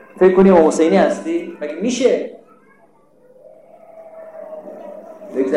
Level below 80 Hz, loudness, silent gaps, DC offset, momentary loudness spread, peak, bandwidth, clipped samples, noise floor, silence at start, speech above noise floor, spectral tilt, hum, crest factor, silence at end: -54 dBFS; -15 LUFS; none; 0.1%; 25 LU; -4 dBFS; 11.5 kHz; under 0.1%; -53 dBFS; 0.15 s; 39 dB; -6 dB/octave; none; 14 dB; 0 s